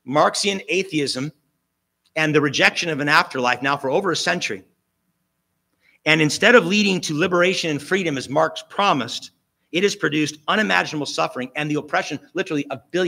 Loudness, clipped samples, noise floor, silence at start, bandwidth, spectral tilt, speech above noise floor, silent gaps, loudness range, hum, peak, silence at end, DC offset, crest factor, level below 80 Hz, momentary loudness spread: -20 LUFS; under 0.1%; -74 dBFS; 0.05 s; 16 kHz; -4 dB/octave; 54 dB; none; 4 LU; none; 0 dBFS; 0 s; under 0.1%; 22 dB; -68 dBFS; 10 LU